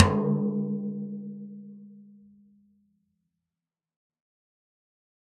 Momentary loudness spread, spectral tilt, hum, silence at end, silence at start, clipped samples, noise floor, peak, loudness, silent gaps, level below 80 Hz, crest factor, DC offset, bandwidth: 23 LU; -8 dB/octave; none; 3.2 s; 0 s; under 0.1%; under -90 dBFS; -2 dBFS; -29 LUFS; none; -60 dBFS; 30 dB; under 0.1%; 8.4 kHz